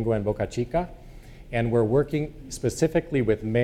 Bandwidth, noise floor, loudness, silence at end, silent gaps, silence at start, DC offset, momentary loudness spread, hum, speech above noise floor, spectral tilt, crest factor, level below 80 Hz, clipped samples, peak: 15 kHz; -44 dBFS; -26 LUFS; 0 s; none; 0 s; under 0.1%; 8 LU; none; 19 dB; -7 dB/octave; 16 dB; -42 dBFS; under 0.1%; -8 dBFS